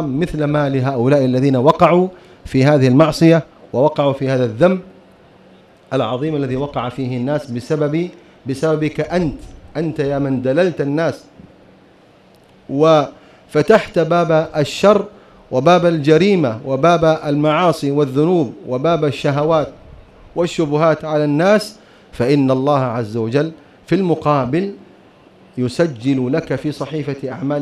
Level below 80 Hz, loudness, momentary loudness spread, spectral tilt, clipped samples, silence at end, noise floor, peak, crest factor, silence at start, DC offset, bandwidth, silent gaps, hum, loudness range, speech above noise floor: -46 dBFS; -16 LUFS; 11 LU; -7 dB/octave; under 0.1%; 0 s; -48 dBFS; 0 dBFS; 16 dB; 0 s; under 0.1%; 13 kHz; none; none; 6 LU; 33 dB